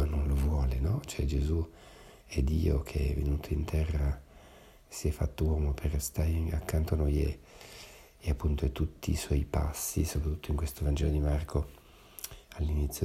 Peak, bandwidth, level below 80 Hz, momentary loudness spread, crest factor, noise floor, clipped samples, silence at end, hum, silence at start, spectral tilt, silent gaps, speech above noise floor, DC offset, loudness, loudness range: -16 dBFS; 15.5 kHz; -34 dBFS; 14 LU; 14 dB; -55 dBFS; under 0.1%; 0 s; none; 0 s; -6.5 dB/octave; none; 25 dB; under 0.1%; -32 LUFS; 1 LU